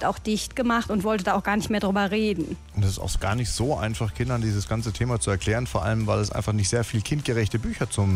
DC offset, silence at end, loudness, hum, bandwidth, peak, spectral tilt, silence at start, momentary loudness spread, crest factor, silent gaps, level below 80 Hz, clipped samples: under 0.1%; 0 s; -25 LUFS; none; 15.5 kHz; -10 dBFS; -5.5 dB/octave; 0 s; 4 LU; 14 dB; none; -38 dBFS; under 0.1%